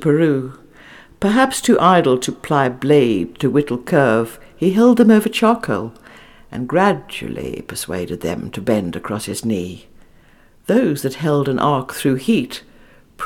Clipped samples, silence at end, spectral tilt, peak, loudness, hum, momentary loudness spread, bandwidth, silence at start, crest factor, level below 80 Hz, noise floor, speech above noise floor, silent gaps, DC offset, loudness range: under 0.1%; 0 s; -6 dB/octave; 0 dBFS; -17 LUFS; none; 14 LU; 17.5 kHz; 0 s; 16 dB; -48 dBFS; -49 dBFS; 32 dB; none; under 0.1%; 7 LU